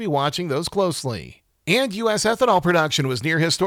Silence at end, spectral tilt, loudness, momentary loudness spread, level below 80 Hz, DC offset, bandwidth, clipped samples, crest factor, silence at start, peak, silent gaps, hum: 0 s; -4.5 dB/octave; -21 LUFS; 9 LU; -54 dBFS; under 0.1%; 19.5 kHz; under 0.1%; 16 dB; 0 s; -4 dBFS; none; none